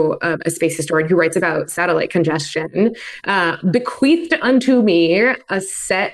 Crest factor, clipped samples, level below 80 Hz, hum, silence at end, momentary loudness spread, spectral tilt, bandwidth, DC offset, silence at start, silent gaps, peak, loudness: 14 dB; under 0.1%; -58 dBFS; none; 0 s; 7 LU; -5 dB/octave; 12.5 kHz; under 0.1%; 0 s; none; -4 dBFS; -17 LUFS